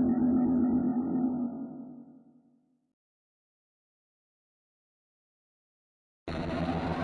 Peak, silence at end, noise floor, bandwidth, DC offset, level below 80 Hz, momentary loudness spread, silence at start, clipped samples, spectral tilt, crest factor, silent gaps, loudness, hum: -18 dBFS; 0 s; -68 dBFS; 5 kHz; under 0.1%; -58 dBFS; 20 LU; 0 s; under 0.1%; -9 dB/octave; 16 dB; 2.93-6.26 s; -30 LUFS; none